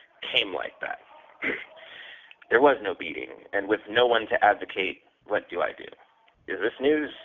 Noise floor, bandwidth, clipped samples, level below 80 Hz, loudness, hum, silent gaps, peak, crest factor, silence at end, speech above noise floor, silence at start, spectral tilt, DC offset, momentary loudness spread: -47 dBFS; 4.2 kHz; under 0.1%; -66 dBFS; -26 LUFS; none; none; -6 dBFS; 22 dB; 0 s; 21 dB; 0.2 s; 0 dB/octave; under 0.1%; 21 LU